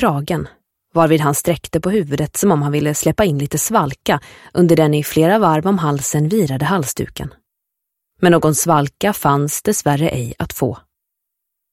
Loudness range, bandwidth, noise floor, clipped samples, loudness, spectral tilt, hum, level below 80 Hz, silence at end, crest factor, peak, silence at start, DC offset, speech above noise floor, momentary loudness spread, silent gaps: 2 LU; 16.5 kHz; -78 dBFS; under 0.1%; -16 LUFS; -5.5 dB/octave; none; -44 dBFS; 0.95 s; 16 dB; 0 dBFS; 0 s; under 0.1%; 62 dB; 10 LU; none